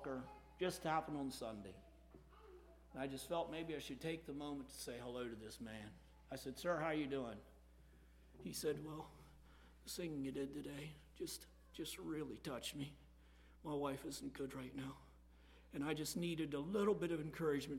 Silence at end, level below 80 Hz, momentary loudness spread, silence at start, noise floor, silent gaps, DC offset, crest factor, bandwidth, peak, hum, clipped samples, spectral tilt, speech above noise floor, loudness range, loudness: 0 s; -66 dBFS; 21 LU; 0 s; -65 dBFS; none; under 0.1%; 20 dB; 16.5 kHz; -26 dBFS; none; under 0.1%; -5 dB/octave; 20 dB; 5 LU; -46 LUFS